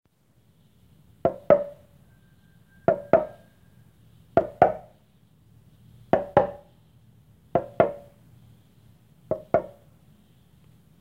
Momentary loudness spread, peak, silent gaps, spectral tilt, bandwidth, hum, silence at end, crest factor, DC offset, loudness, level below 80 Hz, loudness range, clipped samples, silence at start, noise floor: 16 LU; -2 dBFS; none; -8.5 dB/octave; 6.2 kHz; none; 1.35 s; 28 dB; under 0.1%; -25 LUFS; -58 dBFS; 3 LU; under 0.1%; 1.25 s; -63 dBFS